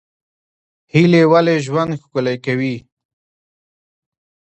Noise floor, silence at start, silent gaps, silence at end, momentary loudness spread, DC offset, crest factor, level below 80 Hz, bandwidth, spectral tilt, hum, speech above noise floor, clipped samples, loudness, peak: under -90 dBFS; 0.95 s; none; 1.6 s; 10 LU; under 0.1%; 18 dB; -60 dBFS; 8.4 kHz; -7 dB/octave; none; over 75 dB; under 0.1%; -15 LUFS; 0 dBFS